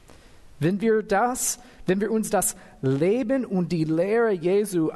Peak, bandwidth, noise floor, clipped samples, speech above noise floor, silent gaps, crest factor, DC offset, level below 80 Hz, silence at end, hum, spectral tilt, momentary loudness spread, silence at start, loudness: -10 dBFS; 12.5 kHz; -48 dBFS; under 0.1%; 25 dB; none; 14 dB; under 0.1%; -54 dBFS; 0 s; none; -5.5 dB/octave; 5 LU; 0.45 s; -24 LUFS